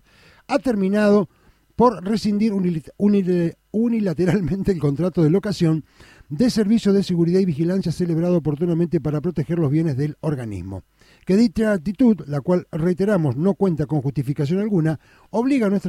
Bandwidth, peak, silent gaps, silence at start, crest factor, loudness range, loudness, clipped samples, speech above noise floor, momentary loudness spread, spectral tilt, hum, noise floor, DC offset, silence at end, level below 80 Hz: 13 kHz; -4 dBFS; none; 0.5 s; 16 dB; 2 LU; -20 LUFS; under 0.1%; 28 dB; 7 LU; -8 dB/octave; none; -48 dBFS; under 0.1%; 0 s; -48 dBFS